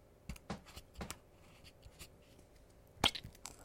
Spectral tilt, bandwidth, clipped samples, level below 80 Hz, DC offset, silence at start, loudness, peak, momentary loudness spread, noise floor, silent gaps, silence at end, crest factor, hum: -2.5 dB/octave; 16.5 kHz; under 0.1%; -60 dBFS; under 0.1%; 0.05 s; -41 LUFS; -14 dBFS; 28 LU; -63 dBFS; none; 0 s; 34 dB; none